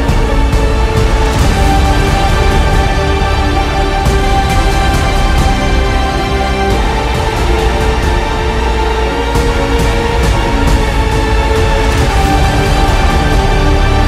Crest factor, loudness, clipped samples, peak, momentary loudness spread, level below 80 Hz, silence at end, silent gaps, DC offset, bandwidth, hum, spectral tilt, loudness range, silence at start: 10 dB; -12 LUFS; under 0.1%; 0 dBFS; 2 LU; -12 dBFS; 0 s; none; under 0.1%; 15 kHz; none; -5.5 dB/octave; 2 LU; 0 s